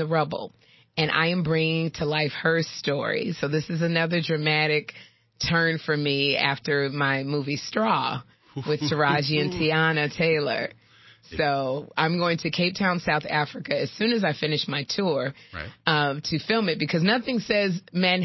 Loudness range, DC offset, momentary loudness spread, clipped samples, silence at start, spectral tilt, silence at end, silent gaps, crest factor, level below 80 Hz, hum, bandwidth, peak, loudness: 2 LU; under 0.1%; 7 LU; under 0.1%; 0 s; -5.5 dB/octave; 0 s; none; 20 dB; -56 dBFS; none; 6.2 kHz; -4 dBFS; -24 LUFS